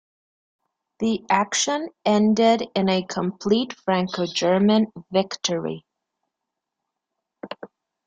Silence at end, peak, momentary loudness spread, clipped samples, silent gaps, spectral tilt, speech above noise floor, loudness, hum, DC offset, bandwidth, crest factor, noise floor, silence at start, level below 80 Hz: 0.4 s; -4 dBFS; 12 LU; under 0.1%; none; -4.5 dB/octave; 62 dB; -22 LUFS; none; under 0.1%; 9.2 kHz; 20 dB; -83 dBFS; 1 s; -64 dBFS